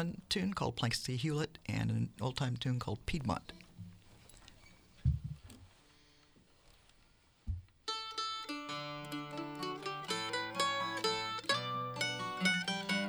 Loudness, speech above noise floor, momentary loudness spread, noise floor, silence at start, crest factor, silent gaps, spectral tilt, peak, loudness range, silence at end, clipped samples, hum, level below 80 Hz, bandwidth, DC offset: -37 LUFS; 31 dB; 16 LU; -67 dBFS; 0 s; 22 dB; none; -4.5 dB/octave; -18 dBFS; 10 LU; 0 s; under 0.1%; none; -54 dBFS; over 20 kHz; under 0.1%